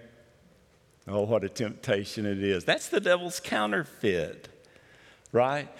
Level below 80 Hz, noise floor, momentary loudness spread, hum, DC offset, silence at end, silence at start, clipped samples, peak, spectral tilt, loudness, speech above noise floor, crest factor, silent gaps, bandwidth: -68 dBFS; -62 dBFS; 7 LU; none; under 0.1%; 0 s; 0 s; under 0.1%; -10 dBFS; -4.5 dB/octave; -28 LUFS; 34 dB; 20 dB; none; 16.5 kHz